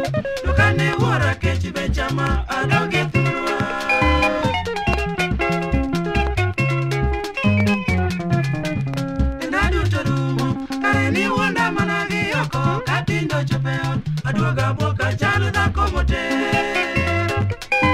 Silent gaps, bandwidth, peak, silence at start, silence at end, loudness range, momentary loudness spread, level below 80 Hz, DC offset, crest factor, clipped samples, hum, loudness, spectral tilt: none; 15 kHz; -2 dBFS; 0 s; 0 s; 1 LU; 5 LU; -30 dBFS; under 0.1%; 18 dB; under 0.1%; none; -20 LUFS; -6 dB/octave